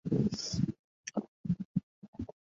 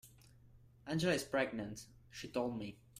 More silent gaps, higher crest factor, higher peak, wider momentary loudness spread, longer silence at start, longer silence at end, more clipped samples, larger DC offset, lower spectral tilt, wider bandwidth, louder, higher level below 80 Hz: first, 0.79-1.04 s, 1.28-1.44 s, 1.65-1.75 s, 1.83-2.02 s, 2.08-2.13 s vs none; about the same, 18 dB vs 20 dB; first, -18 dBFS vs -22 dBFS; second, 14 LU vs 17 LU; about the same, 0.05 s vs 0.05 s; first, 0.25 s vs 0 s; neither; neither; about the same, -6 dB/octave vs -5 dB/octave; second, 8 kHz vs 15.5 kHz; about the same, -37 LUFS vs -39 LUFS; first, -58 dBFS vs -66 dBFS